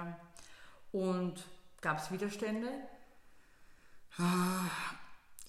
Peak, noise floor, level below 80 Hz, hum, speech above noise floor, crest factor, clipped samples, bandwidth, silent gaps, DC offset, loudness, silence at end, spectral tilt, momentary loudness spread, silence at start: -20 dBFS; -60 dBFS; -68 dBFS; none; 24 dB; 20 dB; under 0.1%; 15 kHz; none; under 0.1%; -37 LUFS; 0 s; -5.5 dB/octave; 23 LU; 0 s